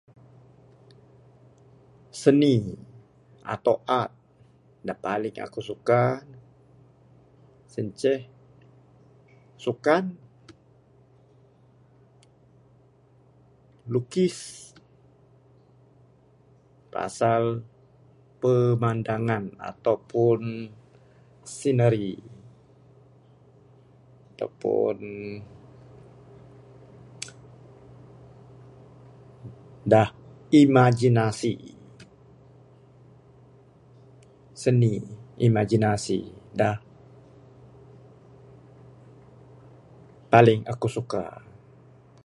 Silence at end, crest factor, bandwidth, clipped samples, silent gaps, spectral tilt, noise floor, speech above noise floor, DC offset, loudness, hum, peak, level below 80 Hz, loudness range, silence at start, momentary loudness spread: 0.95 s; 26 dB; 11.5 kHz; under 0.1%; none; -7 dB/octave; -58 dBFS; 35 dB; under 0.1%; -24 LUFS; none; -2 dBFS; -62 dBFS; 11 LU; 2.15 s; 21 LU